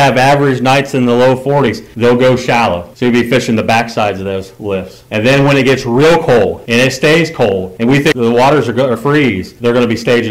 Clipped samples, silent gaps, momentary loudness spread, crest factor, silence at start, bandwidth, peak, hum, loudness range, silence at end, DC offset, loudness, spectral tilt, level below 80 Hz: under 0.1%; none; 7 LU; 8 dB; 0 s; 16 kHz; -4 dBFS; none; 2 LU; 0 s; 0.7%; -11 LUFS; -5.5 dB/octave; -42 dBFS